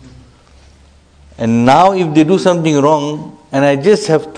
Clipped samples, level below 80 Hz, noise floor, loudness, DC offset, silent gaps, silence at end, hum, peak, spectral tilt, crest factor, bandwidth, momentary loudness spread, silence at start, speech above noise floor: 0.2%; -46 dBFS; -45 dBFS; -12 LUFS; under 0.1%; none; 0 s; none; 0 dBFS; -6 dB/octave; 12 dB; 10 kHz; 11 LU; 0.05 s; 34 dB